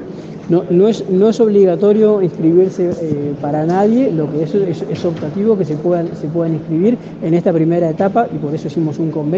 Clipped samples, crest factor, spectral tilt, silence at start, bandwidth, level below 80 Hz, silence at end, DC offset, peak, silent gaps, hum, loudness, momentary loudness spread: under 0.1%; 14 dB; -9 dB/octave; 0 s; 7.6 kHz; -54 dBFS; 0 s; under 0.1%; 0 dBFS; none; none; -15 LUFS; 8 LU